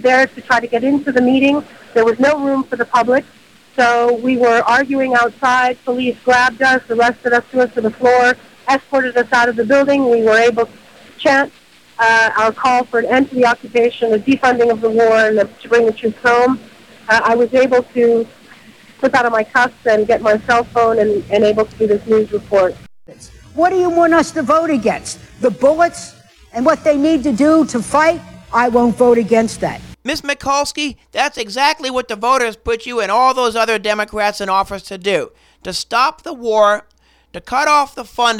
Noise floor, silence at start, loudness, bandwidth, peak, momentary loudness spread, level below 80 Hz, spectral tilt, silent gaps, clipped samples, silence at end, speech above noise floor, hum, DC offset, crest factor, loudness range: -42 dBFS; 0 s; -14 LUFS; 15 kHz; 0 dBFS; 8 LU; -48 dBFS; -4 dB/octave; none; under 0.1%; 0 s; 28 dB; none; under 0.1%; 14 dB; 3 LU